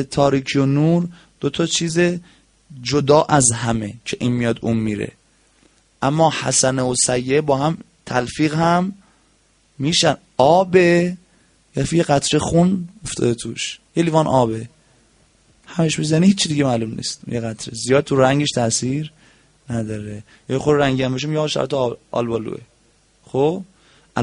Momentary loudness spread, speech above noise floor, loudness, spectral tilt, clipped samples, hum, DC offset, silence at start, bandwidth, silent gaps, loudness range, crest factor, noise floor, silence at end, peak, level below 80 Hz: 13 LU; 40 dB; -18 LUFS; -4.5 dB/octave; under 0.1%; none; under 0.1%; 0 s; 10.5 kHz; none; 4 LU; 18 dB; -58 dBFS; 0 s; 0 dBFS; -48 dBFS